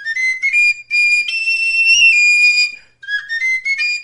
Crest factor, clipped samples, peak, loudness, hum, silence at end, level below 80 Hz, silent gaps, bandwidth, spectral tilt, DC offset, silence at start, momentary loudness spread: 14 dB; under 0.1%; -2 dBFS; -11 LUFS; none; 0 s; -60 dBFS; none; 11.5 kHz; 5 dB/octave; 0.3%; 0 s; 10 LU